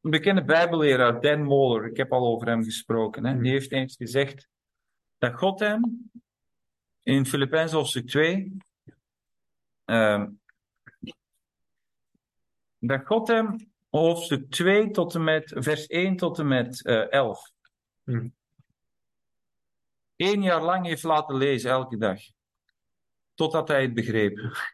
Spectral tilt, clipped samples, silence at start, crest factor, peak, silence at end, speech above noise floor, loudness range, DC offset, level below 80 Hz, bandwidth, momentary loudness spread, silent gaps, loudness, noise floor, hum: -5.5 dB/octave; under 0.1%; 0.05 s; 18 dB; -8 dBFS; 0.05 s; 65 dB; 6 LU; under 0.1%; -66 dBFS; 12.5 kHz; 11 LU; none; -25 LUFS; -89 dBFS; none